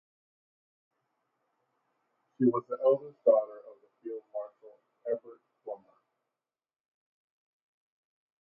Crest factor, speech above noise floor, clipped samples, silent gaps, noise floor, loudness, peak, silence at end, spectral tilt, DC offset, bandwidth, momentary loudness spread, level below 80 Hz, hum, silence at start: 24 dB; over 61 dB; under 0.1%; none; under -90 dBFS; -30 LUFS; -12 dBFS; 2.65 s; -9 dB/octave; under 0.1%; 3.1 kHz; 21 LU; -90 dBFS; none; 2.4 s